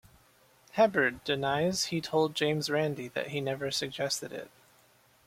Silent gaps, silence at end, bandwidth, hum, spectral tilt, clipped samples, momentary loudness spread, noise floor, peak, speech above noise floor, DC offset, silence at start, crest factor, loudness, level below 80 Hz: none; 0.8 s; 16.5 kHz; none; -4 dB/octave; under 0.1%; 9 LU; -64 dBFS; -10 dBFS; 33 dB; under 0.1%; 0.75 s; 20 dB; -30 LUFS; -66 dBFS